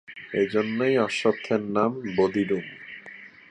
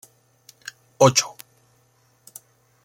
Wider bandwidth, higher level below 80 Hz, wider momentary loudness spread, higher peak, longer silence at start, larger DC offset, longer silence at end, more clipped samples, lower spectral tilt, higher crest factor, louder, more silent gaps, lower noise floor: second, 10 kHz vs 17 kHz; about the same, -64 dBFS vs -66 dBFS; second, 17 LU vs 27 LU; second, -8 dBFS vs -2 dBFS; second, 0.1 s vs 1 s; neither; second, 0.2 s vs 1.55 s; neither; first, -6 dB/octave vs -3.5 dB/octave; second, 18 dB vs 24 dB; second, -25 LUFS vs -19 LUFS; neither; second, -46 dBFS vs -62 dBFS